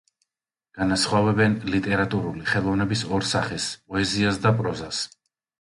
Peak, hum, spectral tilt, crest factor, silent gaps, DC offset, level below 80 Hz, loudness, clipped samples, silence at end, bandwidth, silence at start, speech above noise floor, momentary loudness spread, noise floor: -8 dBFS; none; -5 dB/octave; 16 dB; none; under 0.1%; -48 dBFS; -24 LUFS; under 0.1%; 0.55 s; 11.5 kHz; 0.75 s; 66 dB; 8 LU; -89 dBFS